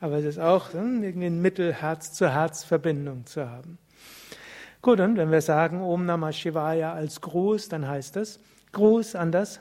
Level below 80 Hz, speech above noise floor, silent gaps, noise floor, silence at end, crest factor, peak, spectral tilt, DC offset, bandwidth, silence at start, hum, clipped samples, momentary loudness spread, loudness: -66 dBFS; 23 dB; none; -47 dBFS; 0 s; 18 dB; -6 dBFS; -6.5 dB/octave; under 0.1%; 16 kHz; 0 s; none; under 0.1%; 15 LU; -25 LUFS